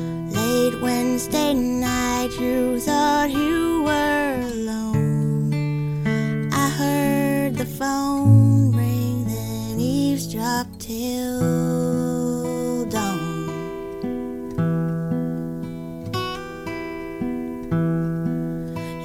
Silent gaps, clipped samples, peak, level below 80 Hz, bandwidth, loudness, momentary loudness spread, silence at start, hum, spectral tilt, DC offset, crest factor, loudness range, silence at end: none; under 0.1%; -4 dBFS; -44 dBFS; 16.5 kHz; -22 LUFS; 10 LU; 0 s; none; -6 dB/octave; under 0.1%; 18 dB; 7 LU; 0 s